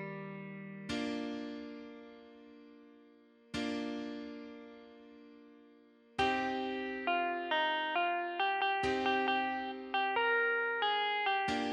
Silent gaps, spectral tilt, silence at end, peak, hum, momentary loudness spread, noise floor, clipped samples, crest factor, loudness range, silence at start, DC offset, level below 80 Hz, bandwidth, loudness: none; -4 dB/octave; 0 s; -20 dBFS; none; 18 LU; -62 dBFS; under 0.1%; 16 dB; 12 LU; 0 s; under 0.1%; -68 dBFS; 11 kHz; -34 LUFS